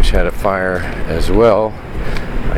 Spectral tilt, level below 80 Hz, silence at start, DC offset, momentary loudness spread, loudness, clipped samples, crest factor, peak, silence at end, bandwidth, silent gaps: -6 dB/octave; -18 dBFS; 0 s; under 0.1%; 12 LU; -16 LUFS; under 0.1%; 14 dB; 0 dBFS; 0 s; 14 kHz; none